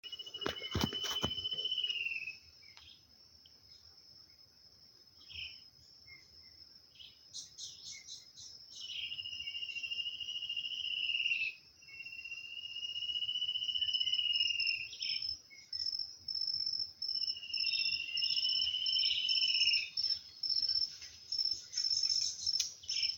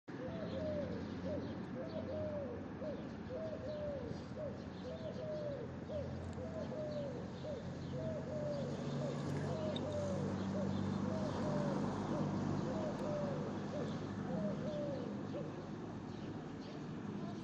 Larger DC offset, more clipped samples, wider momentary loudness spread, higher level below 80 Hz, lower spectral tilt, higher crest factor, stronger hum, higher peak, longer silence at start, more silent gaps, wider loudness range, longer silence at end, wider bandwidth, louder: neither; neither; first, 18 LU vs 7 LU; about the same, -66 dBFS vs -66 dBFS; second, -0.5 dB/octave vs -7.5 dB/octave; first, 22 dB vs 16 dB; neither; first, -16 dBFS vs -26 dBFS; about the same, 0.05 s vs 0.05 s; neither; first, 21 LU vs 5 LU; about the same, 0 s vs 0 s; first, 17 kHz vs 9.2 kHz; first, -34 LUFS vs -42 LUFS